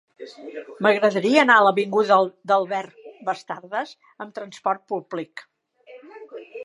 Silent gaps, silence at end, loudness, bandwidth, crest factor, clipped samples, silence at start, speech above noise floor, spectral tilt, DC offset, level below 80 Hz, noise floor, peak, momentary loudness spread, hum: none; 0 s; -21 LUFS; 11.5 kHz; 20 dB; under 0.1%; 0.2 s; 26 dB; -5 dB/octave; under 0.1%; -78 dBFS; -48 dBFS; -2 dBFS; 24 LU; none